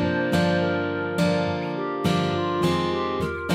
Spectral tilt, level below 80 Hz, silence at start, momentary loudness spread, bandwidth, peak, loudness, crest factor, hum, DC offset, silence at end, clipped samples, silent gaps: -6.5 dB/octave; -50 dBFS; 0 s; 5 LU; 15.5 kHz; -10 dBFS; -24 LUFS; 14 dB; none; under 0.1%; 0 s; under 0.1%; none